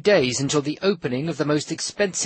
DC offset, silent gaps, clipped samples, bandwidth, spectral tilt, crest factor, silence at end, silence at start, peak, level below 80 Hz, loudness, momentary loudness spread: under 0.1%; none; under 0.1%; 8.8 kHz; -4 dB/octave; 16 dB; 0 s; 0.05 s; -6 dBFS; -58 dBFS; -23 LUFS; 7 LU